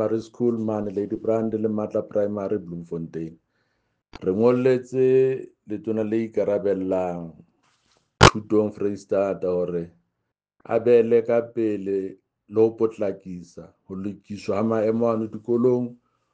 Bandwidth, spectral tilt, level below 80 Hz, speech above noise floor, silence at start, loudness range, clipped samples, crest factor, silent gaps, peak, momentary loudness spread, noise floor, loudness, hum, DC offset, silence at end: 9.6 kHz; -6 dB/octave; -48 dBFS; 57 dB; 0 s; 4 LU; under 0.1%; 22 dB; none; -2 dBFS; 15 LU; -80 dBFS; -23 LUFS; none; under 0.1%; 0.4 s